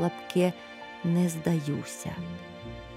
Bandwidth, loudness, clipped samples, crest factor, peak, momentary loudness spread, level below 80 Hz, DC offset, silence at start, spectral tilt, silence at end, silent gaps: 15.5 kHz; -30 LUFS; under 0.1%; 18 dB; -12 dBFS; 15 LU; -56 dBFS; under 0.1%; 0 s; -6.5 dB/octave; 0 s; none